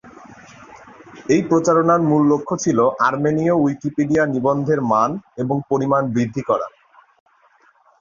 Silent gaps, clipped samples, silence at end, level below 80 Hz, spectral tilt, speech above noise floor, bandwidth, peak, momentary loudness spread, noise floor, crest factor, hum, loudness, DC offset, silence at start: none; under 0.1%; 1.3 s; -56 dBFS; -7 dB/octave; 38 dB; 7.4 kHz; -4 dBFS; 7 LU; -56 dBFS; 16 dB; none; -18 LUFS; under 0.1%; 0.05 s